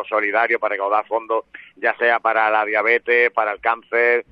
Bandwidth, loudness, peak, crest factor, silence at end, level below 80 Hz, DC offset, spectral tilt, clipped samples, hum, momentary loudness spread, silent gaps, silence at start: 5.2 kHz; -18 LUFS; -2 dBFS; 16 dB; 0.1 s; -66 dBFS; under 0.1%; -5 dB/octave; under 0.1%; none; 7 LU; none; 0 s